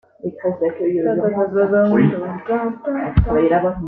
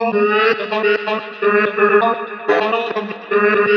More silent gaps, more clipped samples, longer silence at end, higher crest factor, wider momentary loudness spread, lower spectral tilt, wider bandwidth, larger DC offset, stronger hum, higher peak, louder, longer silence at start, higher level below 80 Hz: neither; neither; about the same, 0 s vs 0 s; about the same, 16 dB vs 14 dB; about the same, 9 LU vs 8 LU; first, -11.5 dB/octave vs -6 dB/octave; second, 4 kHz vs 6.4 kHz; neither; neither; about the same, -2 dBFS vs -2 dBFS; about the same, -18 LUFS vs -16 LUFS; first, 0.25 s vs 0 s; first, -32 dBFS vs -80 dBFS